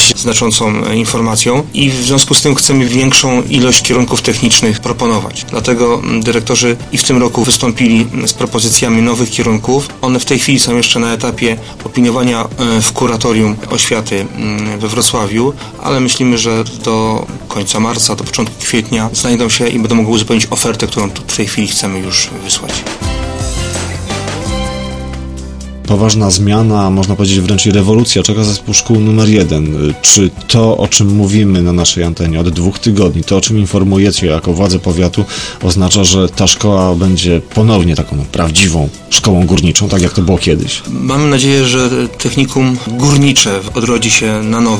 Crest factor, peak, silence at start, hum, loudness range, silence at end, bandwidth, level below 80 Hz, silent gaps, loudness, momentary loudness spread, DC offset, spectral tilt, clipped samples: 10 dB; 0 dBFS; 0 s; none; 4 LU; 0 s; 11 kHz; -30 dBFS; none; -10 LUFS; 9 LU; under 0.1%; -4 dB/octave; 0.3%